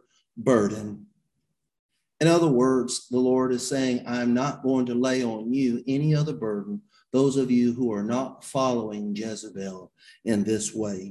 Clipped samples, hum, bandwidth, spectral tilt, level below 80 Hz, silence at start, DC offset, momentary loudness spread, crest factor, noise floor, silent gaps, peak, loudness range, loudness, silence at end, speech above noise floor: under 0.1%; none; 12 kHz; -6 dB/octave; -62 dBFS; 0.35 s; under 0.1%; 13 LU; 18 dB; -79 dBFS; 1.79-1.89 s; -6 dBFS; 4 LU; -25 LUFS; 0 s; 55 dB